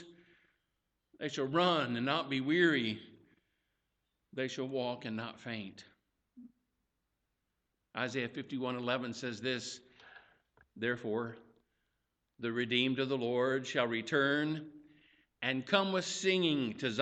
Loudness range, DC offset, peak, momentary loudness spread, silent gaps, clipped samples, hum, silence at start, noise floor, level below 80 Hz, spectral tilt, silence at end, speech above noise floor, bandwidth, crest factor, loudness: 9 LU; under 0.1%; -14 dBFS; 13 LU; none; under 0.1%; none; 0 s; -84 dBFS; -78 dBFS; -4.5 dB/octave; 0 s; 50 dB; 8.8 kHz; 22 dB; -34 LUFS